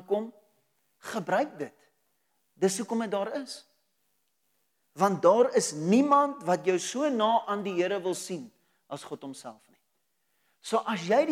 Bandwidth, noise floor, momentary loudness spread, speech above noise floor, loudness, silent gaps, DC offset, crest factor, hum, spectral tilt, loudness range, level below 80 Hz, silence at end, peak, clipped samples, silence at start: 16 kHz; -78 dBFS; 20 LU; 50 dB; -27 LUFS; none; under 0.1%; 20 dB; none; -4.5 dB/octave; 9 LU; under -90 dBFS; 0 s; -10 dBFS; under 0.1%; 0.1 s